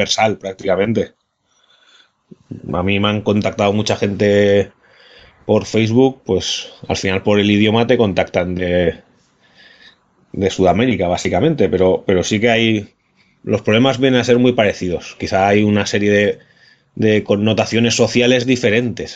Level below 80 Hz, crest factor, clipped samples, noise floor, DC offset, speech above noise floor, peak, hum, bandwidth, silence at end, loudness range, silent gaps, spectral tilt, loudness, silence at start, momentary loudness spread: -50 dBFS; 16 dB; under 0.1%; -61 dBFS; under 0.1%; 46 dB; 0 dBFS; none; 8 kHz; 0 s; 4 LU; none; -5.5 dB/octave; -15 LUFS; 0 s; 9 LU